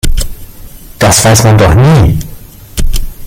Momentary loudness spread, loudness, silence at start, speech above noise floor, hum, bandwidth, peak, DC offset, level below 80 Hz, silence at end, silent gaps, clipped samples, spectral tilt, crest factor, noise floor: 16 LU; -7 LUFS; 0.05 s; 24 dB; none; 17.5 kHz; 0 dBFS; under 0.1%; -16 dBFS; 0 s; none; 0.2%; -4.5 dB/octave; 8 dB; -28 dBFS